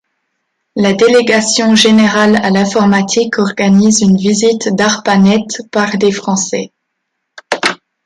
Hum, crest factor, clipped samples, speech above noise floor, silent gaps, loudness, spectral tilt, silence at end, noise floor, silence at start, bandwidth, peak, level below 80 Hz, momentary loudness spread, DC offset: none; 12 dB; under 0.1%; 61 dB; none; -11 LUFS; -4 dB/octave; 0.3 s; -71 dBFS; 0.75 s; 11.5 kHz; 0 dBFS; -52 dBFS; 8 LU; under 0.1%